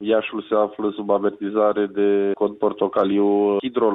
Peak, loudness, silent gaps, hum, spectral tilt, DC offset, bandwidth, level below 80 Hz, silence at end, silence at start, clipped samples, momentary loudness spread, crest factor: -6 dBFS; -21 LUFS; none; none; -9.5 dB/octave; under 0.1%; 4 kHz; -64 dBFS; 0 s; 0 s; under 0.1%; 4 LU; 14 dB